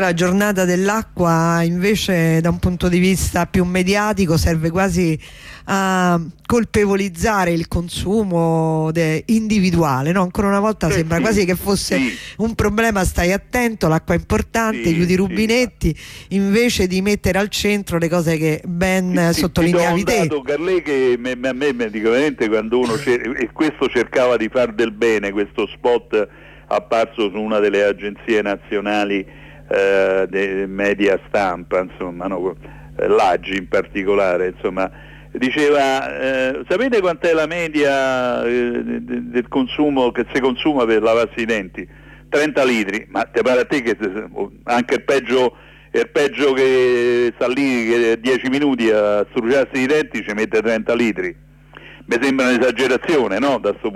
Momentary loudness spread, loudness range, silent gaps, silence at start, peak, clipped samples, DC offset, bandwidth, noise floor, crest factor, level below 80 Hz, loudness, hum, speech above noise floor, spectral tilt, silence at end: 7 LU; 3 LU; none; 0 s; -6 dBFS; under 0.1%; under 0.1%; 15.5 kHz; -41 dBFS; 12 dB; -38 dBFS; -18 LUFS; none; 24 dB; -5.5 dB/octave; 0 s